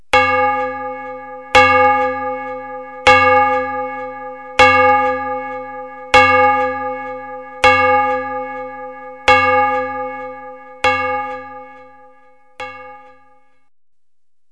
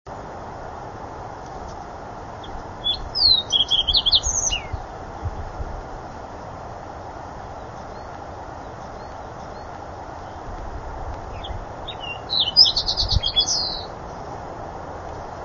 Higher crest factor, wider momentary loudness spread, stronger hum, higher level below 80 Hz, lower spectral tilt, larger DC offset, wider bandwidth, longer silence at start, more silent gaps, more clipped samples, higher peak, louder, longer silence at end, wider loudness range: second, 16 dB vs 26 dB; about the same, 20 LU vs 20 LU; neither; second, -46 dBFS vs -38 dBFS; first, -3.5 dB/octave vs -2 dB/octave; first, 0.4% vs under 0.1%; first, 11 kHz vs 7.4 kHz; about the same, 0.15 s vs 0.05 s; neither; neither; about the same, 0 dBFS vs 0 dBFS; first, -14 LUFS vs -19 LUFS; first, 1.55 s vs 0 s; second, 10 LU vs 16 LU